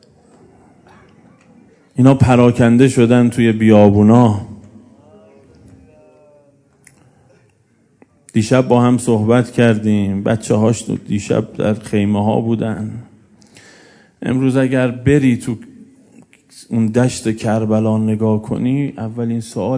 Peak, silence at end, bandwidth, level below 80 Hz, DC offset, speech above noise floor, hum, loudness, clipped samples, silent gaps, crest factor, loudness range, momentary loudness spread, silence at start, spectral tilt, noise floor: 0 dBFS; 0 s; 11 kHz; -48 dBFS; under 0.1%; 43 dB; none; -14 LUFS; 0.1%; none; 16 dB; 8 LU; 11 LU; 1.95 s; -7.5 dB/octave; -56 dBFS